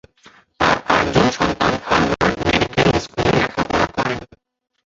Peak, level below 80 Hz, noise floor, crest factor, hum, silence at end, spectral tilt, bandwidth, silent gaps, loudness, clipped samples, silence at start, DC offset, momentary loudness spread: -2 dBFS; -38 dBFS; -50 dBFS; 18 dB; none; 0.6 s; -5 dB/octave; 8 kHz; none; -18 LUFS; under 0.1%; 0.6 s; under 0.1%; 4 LU